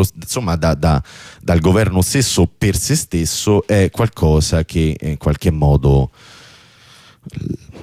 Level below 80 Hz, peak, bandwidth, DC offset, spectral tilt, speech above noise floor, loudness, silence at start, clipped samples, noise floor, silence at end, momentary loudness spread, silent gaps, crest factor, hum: -26 dBFS; -4 dBFS; 16 kHz; under 0.1%; -5.5 dB/octave; 30 dB; -16 LUFS; 0 s; under 0.1%; -45 dBFS; 0 s; 12 LU; none; 12 dB; none